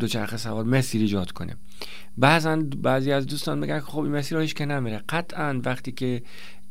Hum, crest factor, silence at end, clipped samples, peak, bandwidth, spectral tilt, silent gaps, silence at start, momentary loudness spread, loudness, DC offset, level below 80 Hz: none; 22 dB; 0.15 s; under 0.1%; -2 dBFS; 16 kHz; -5.5 dB/octave; none; 0 s; 16 LU; -25 LUFS; 3%; -56 dBFS